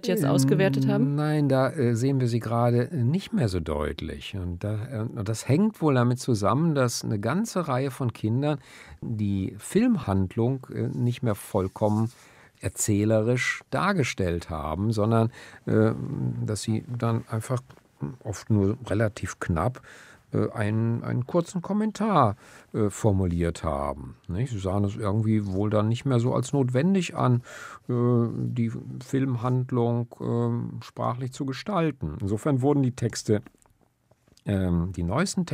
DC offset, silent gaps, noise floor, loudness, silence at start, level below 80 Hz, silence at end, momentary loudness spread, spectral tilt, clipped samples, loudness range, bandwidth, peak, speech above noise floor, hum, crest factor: under 0.1%; none; -64 dBFS; -26 LUFS; 0.05 s; -50 dBFS; 0 s; 9 LU; -6.5 dB/octave; under 0.1%; 3 LU; 15.5 kHz; -6 dBFS; 39 dB; none; 20 dB